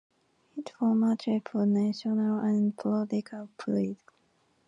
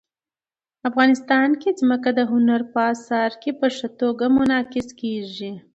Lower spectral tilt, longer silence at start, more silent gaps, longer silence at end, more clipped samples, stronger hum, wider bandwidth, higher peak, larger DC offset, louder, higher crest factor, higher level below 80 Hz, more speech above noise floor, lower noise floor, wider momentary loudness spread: first, -8 dB/octave vs -5 dB/octave; second, 0.55 s vs 0.85 s; neither; first, 0.75 s vs 0.15 s; neither; neither; about the same, 7.8 kHz vs 8 kHz; second, -18 dBFS vs -4 dBFS; neither; second, -29 LUFS vs -20 LUFS; second, 12 dB vs 18 dB; second, -76 dBFS vs -58 dBFS; second, 41 dB vs over 70 dB; second, -69 dBFS vs under -90 dBFS; first, 16 LU vs 10 LU